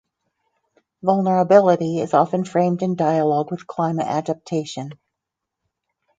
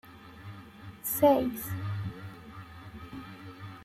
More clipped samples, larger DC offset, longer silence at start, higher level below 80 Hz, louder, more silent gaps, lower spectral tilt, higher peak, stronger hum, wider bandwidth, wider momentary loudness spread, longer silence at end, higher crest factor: neither; neither; first, 1.05 s vs 0.05 s; second, -68 dBFS vs -60 dBFS; first, -19 LUFS vs -29 LUFS; neither; first, -7.5 dB/octave vs -6 dB/octave; first, -2 dBFS vs -12 dBFS; neither; second, 9 kHz vs 16 kHz; second, 12 LU vs 23 LU; first, 1.25 s vs 0 s; about the same, 20 dB vs 20 dB